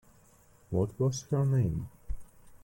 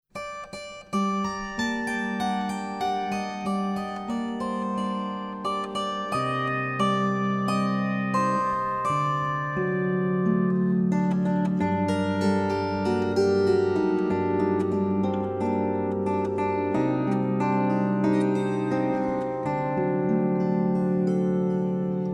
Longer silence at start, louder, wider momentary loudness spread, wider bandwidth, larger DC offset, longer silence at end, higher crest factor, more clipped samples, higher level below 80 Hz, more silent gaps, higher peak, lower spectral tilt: first, 0.7 s vs 0.15 s; second, -31 LUFS vs -26 LUFS; first, 18 LU vs 6 LU; first, 17 kHz vs 11 kHz; neither; about the same, 0.05 s vs 0 s; about the same, 14 dB vs 14 dB; neither; first, -48 dBFS vs -58 dBFS; neither; second, -18 dBFS vs -10 dBFS; about the same, -7.5 dB/octave vs -7 dB/octave